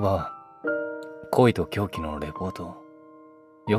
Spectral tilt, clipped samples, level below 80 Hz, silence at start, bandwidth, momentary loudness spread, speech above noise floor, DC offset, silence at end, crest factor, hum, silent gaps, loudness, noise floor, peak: -7.5 dB/octave; under 0.1%; -50 dBFS; 0 s; 15.5 kHz; 18 LU; 26 dB; under 0.1%; 0 s; 22 dB; none; none; -27 LUFS; -51 dBFS; -4 dBFS